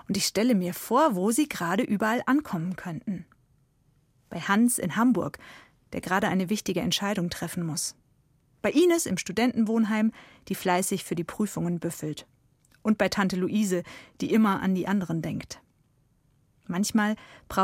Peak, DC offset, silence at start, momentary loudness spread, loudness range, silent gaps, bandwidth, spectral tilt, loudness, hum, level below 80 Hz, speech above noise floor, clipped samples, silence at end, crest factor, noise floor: -8 dBFS; under 0.1%; 0.1 s; 12 LU; 3 LU; none; 16.5 kHz; -4.5 dB/octave; -27 LUFS; none; -60 dBFS; 40 dB; under 0.1%; 0 s; 20 dB; -66 dBFS